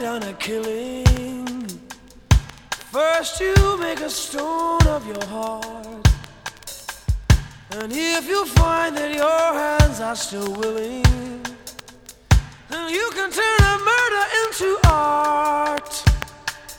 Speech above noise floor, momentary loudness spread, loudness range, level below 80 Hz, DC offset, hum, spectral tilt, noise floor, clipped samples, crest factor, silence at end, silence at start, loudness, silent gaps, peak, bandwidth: 25 dB; 15 LU; 5 LU; -26 dBFS; under 0.1%; none; -4.5 dB/octave; -44 dBFS; under 0.1%; 18 dB; 0 s; 0 s; -20 LUFS; none; -2 dBFS; 19.5 kHz